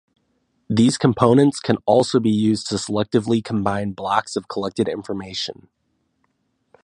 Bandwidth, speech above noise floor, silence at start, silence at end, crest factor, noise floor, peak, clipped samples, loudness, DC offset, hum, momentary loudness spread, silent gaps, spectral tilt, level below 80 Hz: 11.5 kHz; 49 dB; 0.7 s; 1.3 s; 20 dB; -69 dBFS; 0 dBFS; under 0.1%; -20 LUFS; under 0.1%; none; 11 LU; none; -6 dB/octave; -54 dBFS